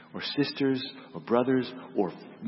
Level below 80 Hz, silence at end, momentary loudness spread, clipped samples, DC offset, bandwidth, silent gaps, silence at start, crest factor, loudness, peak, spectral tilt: -76 dBFS; 0 s; 8 LU; under 0.1%; under 0.1%; 5.8 kHz; none; 0 s; 18 dB; -29 LUFS; -10 dBFS; -9.5 dB/octave